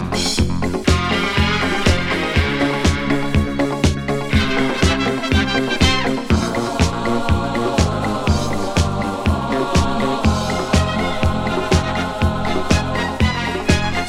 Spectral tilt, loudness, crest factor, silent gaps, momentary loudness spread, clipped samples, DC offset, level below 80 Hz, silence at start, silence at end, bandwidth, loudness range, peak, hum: -5 dB/octave; -18 LUFS; 16 dB; none; 3 LU; under 0.1%; under 0.1%; -26 dBFS; 0 s; 0 s; 15 kHz; 1 LU; 0 dBFS; none